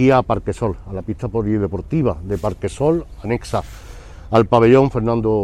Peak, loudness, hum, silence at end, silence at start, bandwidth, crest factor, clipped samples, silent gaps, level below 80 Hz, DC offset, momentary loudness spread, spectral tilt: 0 dBFS; -18 LUFS; none; 0 s; 0 s; 13 kHz; 16 dB; under 0.1%; none; -36 dBFS; under 0.1%; 13 LU; -8 dB/octave